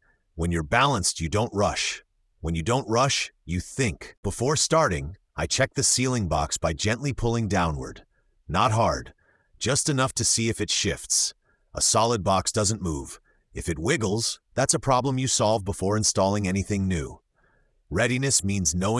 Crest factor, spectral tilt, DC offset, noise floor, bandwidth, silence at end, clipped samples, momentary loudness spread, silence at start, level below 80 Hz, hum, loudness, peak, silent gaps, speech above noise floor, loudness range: 18 dB; -3.5 dB/octave; under 0.1%; -65 dBFS; 12 kHz; 0 s; under 0.1%; 11 LU; 0.35 s; -44 dBFS; none; -24 LUFS; -6 dBFS; 4.17-4.23 s; 40 dB; 2 LU